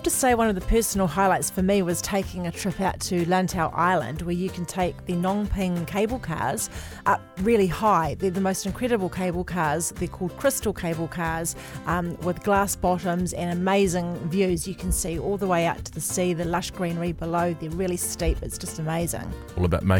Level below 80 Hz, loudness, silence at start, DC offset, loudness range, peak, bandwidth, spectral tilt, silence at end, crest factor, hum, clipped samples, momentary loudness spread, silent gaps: -38 dBFS; -25 LUFS; 0 s; under 0.1%; 3 LU; -8 dBFS; 19 kHz; -5 dB/octave; 0 s; 16 dB; none; under 0.1%; 7 LU; none